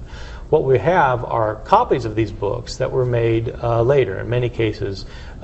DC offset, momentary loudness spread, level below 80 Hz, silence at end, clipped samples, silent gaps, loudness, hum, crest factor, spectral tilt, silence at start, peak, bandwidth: under 0.1%; 11 LU; -36 dBFS; 0 s; under 0.1%; none; -19 LUFS; none; 18 dB; -7.5 dB/octave; 0 s; 0 dBFS; 8.4 kHz